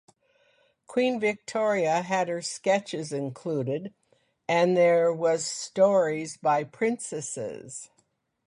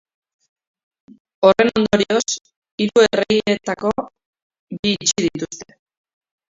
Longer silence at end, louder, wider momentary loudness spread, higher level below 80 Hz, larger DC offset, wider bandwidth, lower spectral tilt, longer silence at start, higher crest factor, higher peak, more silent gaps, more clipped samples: second, 0.65 s vs 0.85 s; second, -26 LUFS vs -18 LUFS; second, 13 LU vs 16 LU; second, -74 dBFS vs -54 dBFS; neither; first, 11.5 kHz vs 7.8 kHz; about the same, -4.5 dB/octave vs -3.5 dB/octave; second, 0.9 s vs 1.4 s; about the same, 18 dB vs 20 dB; second, -8 dBFS vs 0 dBFS; second, none vs 2.56-2.62 s, 2.71-2.78 s, 4.26-4.33 s, 4.42-4.50 s, 4.59-4.67 s, 4.79-4.83 s; neither